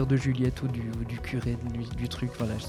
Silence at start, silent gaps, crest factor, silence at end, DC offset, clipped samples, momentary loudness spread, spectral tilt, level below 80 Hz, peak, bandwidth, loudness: 0 s; none; 16 dB; 0 s; under 0.1%; under 0.1%; 8 LU; -7 dB/octave; -42 dBFS; -14 dBFS; 13.5 kHz; -31 LUFS